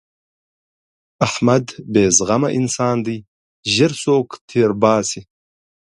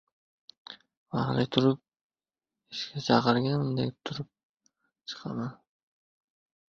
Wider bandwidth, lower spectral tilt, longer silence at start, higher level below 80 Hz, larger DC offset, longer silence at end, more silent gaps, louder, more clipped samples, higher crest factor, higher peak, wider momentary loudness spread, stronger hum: first, 11.5 kHz vs 7.6 kHz; second, -4.5 dB/octave vs -6.5 dB/octave; first, 1.2 s vs 0.7 s; first, -52 dBFS vs -66 dBFS; neither; second, 0.65 s vs 1.15 s; first, 3.28-3.63 s, 4.41-4.48 s vs 0.97-1.06 s, 2.01-2.10 s, 4.43-4.54 s; first, -17 LUFS vs -29 LUFS; neither; second, 18 dB vs 24 dB; first, 0 dBFS vs -6 dBFS; second, 11 LU vs 21 LU; neither